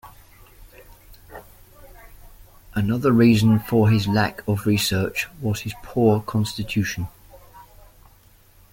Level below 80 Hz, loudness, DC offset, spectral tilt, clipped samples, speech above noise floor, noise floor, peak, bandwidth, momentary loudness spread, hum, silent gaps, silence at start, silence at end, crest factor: -48 dBFS; -21 LUFS; under 0.1%; -6 dB/octave; under 0.1%; 33 dB; -53 dBFS; -6 dBFS; 17 kHz; 15 LU; none; none; 0.05 s; 1.1 s; 18 dB